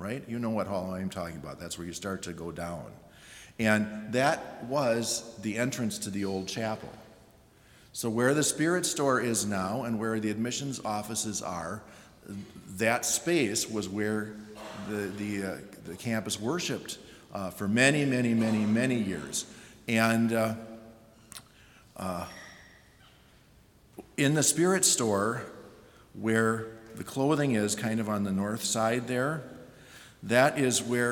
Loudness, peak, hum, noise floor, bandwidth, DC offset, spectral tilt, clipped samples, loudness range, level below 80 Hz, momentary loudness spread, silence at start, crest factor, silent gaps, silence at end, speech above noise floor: -29 LUFS; -6 dBFS; none; -59 dBFS; 18 kHz; under 0.1%; -4 dB/octave; under 0.1%; 7 LU; -64 dBFS; 19 LU; 0 s; 24 dB; none; 0 s; 30 dB